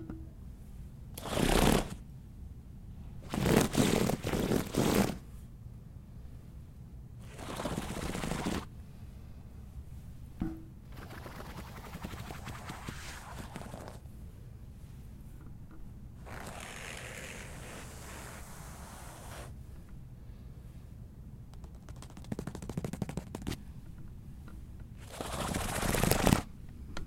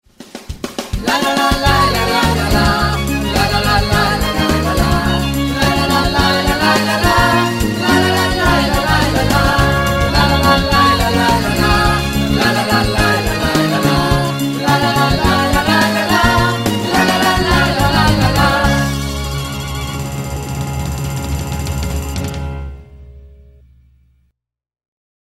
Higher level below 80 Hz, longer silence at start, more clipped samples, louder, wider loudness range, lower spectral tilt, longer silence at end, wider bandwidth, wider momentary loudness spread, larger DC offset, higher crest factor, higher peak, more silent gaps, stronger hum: second, -46 dBFS vs -24 dBFS; second, 0 s vs 0.2 s; neither; second, -35 LUFS vs -14 LUFS; first, 16 LU vs 9 LU; about the same, -5 dB/octave vs -4.5 dB/octave; second, 0 s vs 2.1 s; about the same, 16.5 kHz vs 16.5 kHz; first, 21 LU vs 10 LU; second, under 0.1% vs 0.2%; first, 32 dB vs 14 dB; second, -6 dBFS vs 0 dBFS; neither; neither